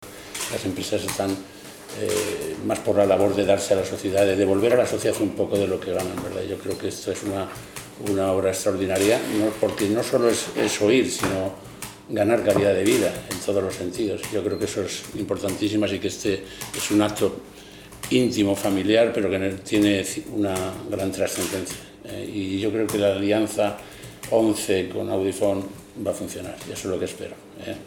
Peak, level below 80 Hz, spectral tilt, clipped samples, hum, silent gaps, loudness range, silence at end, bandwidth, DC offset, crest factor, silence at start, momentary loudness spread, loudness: -4 dBFS; -56 dBFS; -4.5 dB/octave; under 0.1%; none; none; 5 LU; 0 s; 19 kHz; under 0.1%; 20 dB; 0 s; 14 LU; -23 LUFS